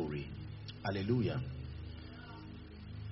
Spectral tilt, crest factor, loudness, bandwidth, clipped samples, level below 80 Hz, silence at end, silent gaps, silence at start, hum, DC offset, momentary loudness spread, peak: -6.5 dB/octave; 18 dB; -41 LUFS; 5.8 kHz; under 0.1%; -54 dBFS; 0 s; none; 0 s; none; under 0.1%; 16 LU; -22 dBFS